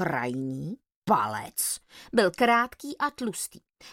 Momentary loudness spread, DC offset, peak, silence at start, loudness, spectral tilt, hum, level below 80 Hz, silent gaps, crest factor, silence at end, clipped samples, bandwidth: 13 LU; under 0.1%; -8 dBFS; 0 s; -27 LUFS; -3.5 dB/octave; none; -64 dBFS; 0.96-1.02 s; 20 dB; 0 s; under 0.1%; 17 kHz